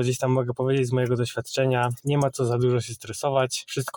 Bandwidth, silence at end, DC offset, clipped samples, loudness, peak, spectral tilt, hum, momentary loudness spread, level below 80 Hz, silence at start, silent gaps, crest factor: 19 kHz; 0 s; under 0.1%; under 0.1%; -25 LUFS; -8 dBFS; -5.5 dB/octave; none; 4 LU; -60 dBFS; 0 s; none; 16 dB